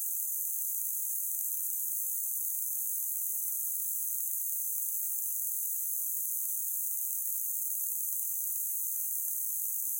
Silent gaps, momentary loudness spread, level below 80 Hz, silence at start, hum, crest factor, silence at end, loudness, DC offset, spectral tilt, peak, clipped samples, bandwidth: none; 0 LU; under -90 dBFS; 0 s; none; 22 dB; 0 s; -30 LUFS; under 0.1%; 6 dB/octave; -12 dBFS; under 0.1%; 16.5 kHz